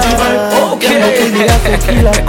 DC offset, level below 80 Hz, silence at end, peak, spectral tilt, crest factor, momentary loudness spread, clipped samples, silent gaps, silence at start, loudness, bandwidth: under 0.1%; -16 dBFS; 0 s; 0 dBFS; -4.5 dB/octave; 10 dB; 2 LU; under 0.1%; none; 0 s; -10 LUFS; 17 kHz